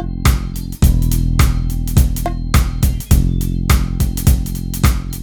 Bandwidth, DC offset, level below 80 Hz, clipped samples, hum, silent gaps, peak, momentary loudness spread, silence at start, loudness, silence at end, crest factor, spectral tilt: over 20 kHz; under 0.1%; -16 dBFS; under 0.1%; none; none; 0 dBFS; 5 LU; 0 s; -17 LUFS; 0 s; 14 dB; -5.5 dB/octave